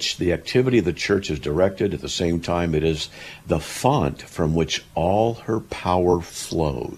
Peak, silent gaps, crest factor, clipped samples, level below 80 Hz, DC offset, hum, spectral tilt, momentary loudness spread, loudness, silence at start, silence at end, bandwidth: -4 dBFS; none; 18 dB; under 0.1%; -40 dBFS; under 0.1%; none; -5.5 dB/octave; 6 LU; -22 LUFS; 0 s; 0 s; 14.5 kHz